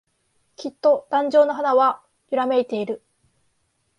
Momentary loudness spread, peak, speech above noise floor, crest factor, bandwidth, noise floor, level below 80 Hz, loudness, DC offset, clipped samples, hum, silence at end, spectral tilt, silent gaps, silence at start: 16 LU; -6 dBFS; 49 dB; 16 dB; 10 kHz; -69 dBFS; -74 dBFS; -20 LUFS; under 0.1%; under 0.1%; none; 1 s; -5.5 dB/octave; none; 0.6 s